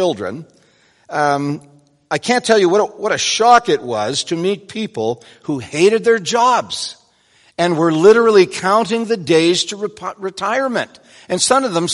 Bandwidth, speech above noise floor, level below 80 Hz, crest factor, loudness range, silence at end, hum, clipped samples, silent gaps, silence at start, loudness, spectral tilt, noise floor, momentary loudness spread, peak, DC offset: 11.5 kHz; 39 dB; -60 dBFS; 16 dB; 3 LU; 0 s; none; under 0.1%; none; 0 s; -16 LUFS; -3.5 dB/octave; -54 dBFS; 14 LU; 0 dBFS; under 0.1%